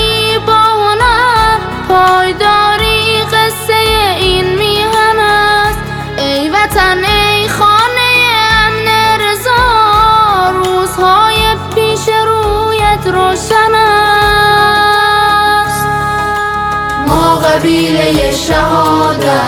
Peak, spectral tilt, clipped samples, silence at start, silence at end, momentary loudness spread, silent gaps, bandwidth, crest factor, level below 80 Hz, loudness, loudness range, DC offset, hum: 0 dBFS; -3.5 dB/octave; under 0.1%; 0 s; 0 s; 5 LU; none; 19.5 kHz; 10 dB; -26 dBFS; -9 LUFS; 2 LU; under 0.1%; none